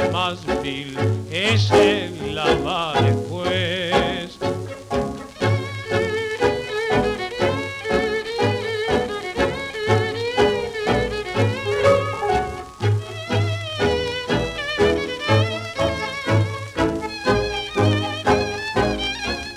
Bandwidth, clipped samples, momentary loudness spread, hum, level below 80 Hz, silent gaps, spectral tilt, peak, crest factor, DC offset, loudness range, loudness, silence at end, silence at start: 13 kHz; under 0.1%; 6 LU; none; -40 dBFS; none; -5.5 dB/octave; -2 dBFS; 18 dB; under 0.1%; 3 LU; -21 LUFS; 0 s; 0 s